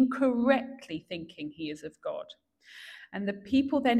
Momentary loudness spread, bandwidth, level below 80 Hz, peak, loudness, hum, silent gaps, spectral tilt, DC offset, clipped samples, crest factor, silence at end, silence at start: 20 LU; 11.5 kHz; -66 dBFS; -10 dBFS; -31 LUFS; none; none; -6 dB/octave; under 0.1%; under 0.1%; 20 dB; 0 s; 0 s